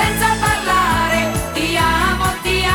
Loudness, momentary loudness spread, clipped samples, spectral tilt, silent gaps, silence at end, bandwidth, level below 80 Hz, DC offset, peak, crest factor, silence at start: -16 LUFS; 3 LU; under 0.1%; -3.5 dB/octave; none; 0 s; over 20 kHz; -28 dBFS; 0.1%; -2 dBFS; 14 dB; 0 s